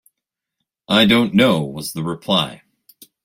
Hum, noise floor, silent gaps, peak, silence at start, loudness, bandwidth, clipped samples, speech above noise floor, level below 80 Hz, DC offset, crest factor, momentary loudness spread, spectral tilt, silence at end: none; -82 dBFS; none; -2 dBFS; 0.9 s; -17 LUFS; 16.5 kHz; under 0.1%; 66 dB; -54 dBFS; under 0.1%; 18 dB; 12 LU; -5 dB/octave; 0.7 s